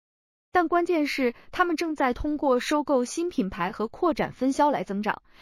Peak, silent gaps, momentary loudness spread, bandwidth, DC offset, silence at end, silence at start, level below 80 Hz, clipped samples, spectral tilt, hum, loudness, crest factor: -8 dBFS; none; 6 LU; 15.5 kHz; under 0.1%; 0.25 s; 0.55 s; -50 dBFS; under 0.1%; -5 dB/octave; none; -26 LUFS; 18 dB